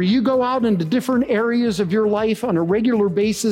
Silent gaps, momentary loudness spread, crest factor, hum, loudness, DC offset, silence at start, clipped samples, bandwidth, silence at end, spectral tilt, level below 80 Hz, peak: none; 2 LU; 10 dB; none; -19 LUFS; under 0.1%; 0 s; under 0.1%; 16 kHz; 0 s; -6 dB/octave; -52 dBFS; -8 dBFS